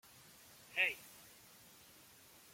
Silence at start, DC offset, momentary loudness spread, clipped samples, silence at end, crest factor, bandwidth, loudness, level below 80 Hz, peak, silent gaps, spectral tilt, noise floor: 0.7 s; under 0.1%; 24 LU; under 0.1%; 1.3 s; 26 dB; 16.5 kHz; -38 LUFS; -82 dBFS; -20 dBFS; none; -0.5 dB/octave; -62 dBFS